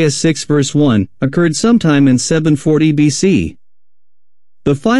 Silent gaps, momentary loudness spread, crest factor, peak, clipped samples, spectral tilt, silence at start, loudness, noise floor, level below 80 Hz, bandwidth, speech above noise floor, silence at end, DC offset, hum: none; 6 LU; 12 dB; -2 dBFS; under 0.1%; -5.5 dB/octave; 0 s; -13 LUFS; under -90 dBFS; -42 dBFS; 12 kHz; over 78 dB; 0 s; under 0.1%; none